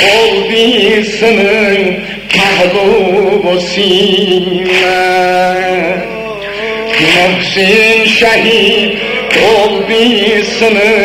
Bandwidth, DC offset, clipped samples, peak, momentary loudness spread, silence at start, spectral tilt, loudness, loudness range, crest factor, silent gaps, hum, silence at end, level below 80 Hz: 16 kHz; under 0.1%; 0.3%; 0 dBFS; 7 LU; 0 s; -4 dB/octave; -8 LUFS; 3 LU; 8 dB; none; none; 0 s; -40 dBFS